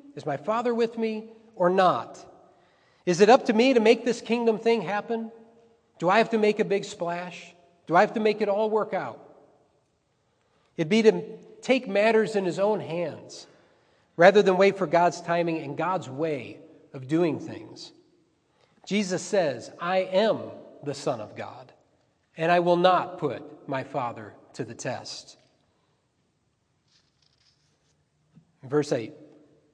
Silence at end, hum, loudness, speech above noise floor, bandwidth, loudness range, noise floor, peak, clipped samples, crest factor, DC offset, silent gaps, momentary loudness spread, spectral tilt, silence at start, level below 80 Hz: 0.5 s; none; -25 LUFS; 47 dB; 10 kHz; 12 LU; -72 dBFS; -2 dBFS; under 0.1%; 24 dB; under 0.1%; none; 20 LU; -5.5 dB/octave; 0.1 s; -80 dBFS